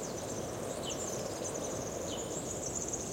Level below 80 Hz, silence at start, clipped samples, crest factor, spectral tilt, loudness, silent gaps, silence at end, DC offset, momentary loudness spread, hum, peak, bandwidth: -58 dBFS; 0 s; under 0.1%; 14 dB; -3.5 dB/octave; -37 LUFS; none; 0 s; under 0.1%; 3 LU; none; -24 dBFS; 16.5 kHz